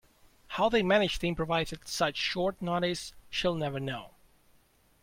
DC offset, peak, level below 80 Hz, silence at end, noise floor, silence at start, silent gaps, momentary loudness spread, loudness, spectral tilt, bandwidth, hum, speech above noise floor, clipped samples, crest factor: under 0.1%; -12 dBFS; -52 dBFS; 0.95 s; -65 dBFS; 0.5 s; none; 11 LU; -30 LUFS; -4.5 dB/octave; 16.5 kHz; none; 35 dB; under 0.1%; 20 dB